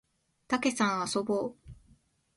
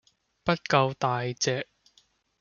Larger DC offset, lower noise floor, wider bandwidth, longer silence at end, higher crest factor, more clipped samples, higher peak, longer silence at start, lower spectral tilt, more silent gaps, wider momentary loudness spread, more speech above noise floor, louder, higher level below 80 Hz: neither; about the same, -65 dBFS vs -66 dBFS; first, 11.5 kHz vs 7.2 kHz; about the same, 0.65 s vs 0.75 s; about the same, 18 dB vs 22 dB; neither; second, -14 dBFS vs -6 dBFS; about the same, 0.5 s vs 0.45 s; about the same, -4 dB/octave vs -4.5 dB/octave; neither; second, 6 LU vs 10 LU; second, 36 dB vs 40 dB; second, -30 LUFS vs -27 LUFS; about the same, -62 dBFS vs -64 dBFS